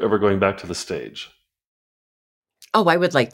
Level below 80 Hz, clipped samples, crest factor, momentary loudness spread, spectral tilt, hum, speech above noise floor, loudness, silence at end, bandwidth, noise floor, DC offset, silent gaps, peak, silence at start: -60 dBFS; under 0.1%; 20 dB; 18 LU; -5 dB/octave; none; over 70 dB; -20 LUFS; 0.05 s; 16.5 kHz; under -90 dBFS; under 0.1%; 1.67-2.42 s; -2 dBFS; 0 s